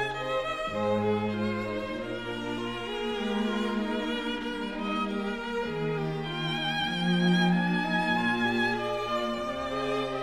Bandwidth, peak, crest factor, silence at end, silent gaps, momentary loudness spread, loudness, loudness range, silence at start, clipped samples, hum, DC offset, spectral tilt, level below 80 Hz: 12.5 kHz; -14 dBFS; 14 dB; 0 s; none; 7 LU; -29 LUFS; 4 LU; 0 s; under 0.1%; none; under 0.1%; -6 dB/octave; -52 dBFS